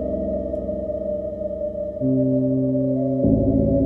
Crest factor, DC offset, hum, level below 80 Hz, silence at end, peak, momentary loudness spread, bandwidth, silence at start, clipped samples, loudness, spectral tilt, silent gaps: 16 dB; under 0.1%; none; -36 dBFS; 0 s; -6 dBFS; 8 LU; 2 kHz; 0 s; under 0.1%; -22 LUFS; -13.5 dB/octave; none